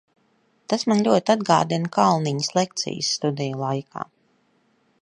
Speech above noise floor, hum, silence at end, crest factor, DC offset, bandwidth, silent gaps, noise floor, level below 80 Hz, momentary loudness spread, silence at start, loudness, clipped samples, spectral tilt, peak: 43 dB; none; 1 s; 20 dB; under 0.1%; 11 kHz; none; -64 dBFS; -68 dBFS; 9 LU; 0.7 s; -22 LUFS; under 0.1%; -5 dB/octave; -4 dBFS